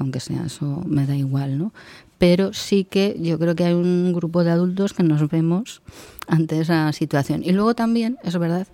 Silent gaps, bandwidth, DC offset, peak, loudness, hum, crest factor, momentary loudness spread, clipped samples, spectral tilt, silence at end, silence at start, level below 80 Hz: none; 16.5 kHz; under 0.1%; -4 dBFS; -21 LUFS; none; 16 dB; 8 LU; under 0.1%; -7 dB/octave; 0.1 s; 0 s; -52 dBFS